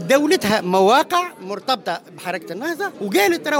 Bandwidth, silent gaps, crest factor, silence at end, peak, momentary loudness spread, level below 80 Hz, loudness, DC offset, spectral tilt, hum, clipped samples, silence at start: 17 kHz; none; 16 dB; 0 s; -4 dBFS; 13 LU; -64 dBFS; -19 LUFS; under 0.1%; -4 dB/octave; none; under 0.1%; 0 s